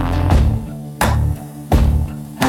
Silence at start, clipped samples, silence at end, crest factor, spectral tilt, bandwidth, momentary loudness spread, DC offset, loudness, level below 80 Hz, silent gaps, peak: 0 s; under 0.1%; 0 s; 16 dB; -6.5 dB/octave; 17 kHz; 11 LU; under 0.1%; -18 LUFS; -20 dBFS; none; 0 dBFS